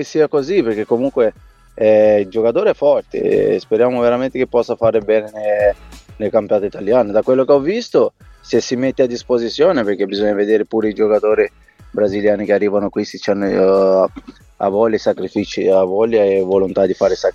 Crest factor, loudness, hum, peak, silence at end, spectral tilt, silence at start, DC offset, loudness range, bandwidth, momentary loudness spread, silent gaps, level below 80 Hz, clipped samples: 14 dB; -16 LUFS; none; -2 dBFS; 0.05 s; -6 dB/octave; 0 s; under 0.1%; 2 LU; 7.6 kHz; 6 LU; none; -48 dBFS; under 0.1%